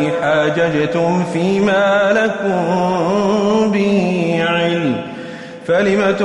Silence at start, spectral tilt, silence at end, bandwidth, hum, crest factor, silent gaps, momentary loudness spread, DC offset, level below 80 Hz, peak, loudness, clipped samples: 0 s; -6 dB/octave; 0 s; 11 kHz; none; 12 dB; none; 5 LU; under 0.1%; -52 dBFS; -4 dBFS; -15 LUFS; under 0.1%